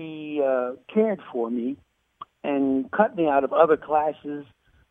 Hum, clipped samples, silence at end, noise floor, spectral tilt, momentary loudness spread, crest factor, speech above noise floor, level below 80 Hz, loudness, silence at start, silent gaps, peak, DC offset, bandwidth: none; under 0.1%; 0.45 s; -47 dBFS; -9 dB/octave; 14 LU; 20 dB; 24 dB; -64 dBFS; -24 LUFS; 0 s; none; -4 dBFS; under 0.1%; 3.8 kHz